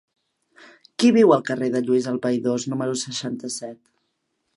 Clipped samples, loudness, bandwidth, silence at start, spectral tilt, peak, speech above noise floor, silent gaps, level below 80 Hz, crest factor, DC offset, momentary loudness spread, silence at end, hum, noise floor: under 0.1%; -21 LUFS; 11.5 kHz; 1 s; -5 dB/octave; -4 dBFS; 53 dB; none; -72 dBFS; 20 dB; under 0.1%; 15 LU; 0.85 s; none; -74 dBFS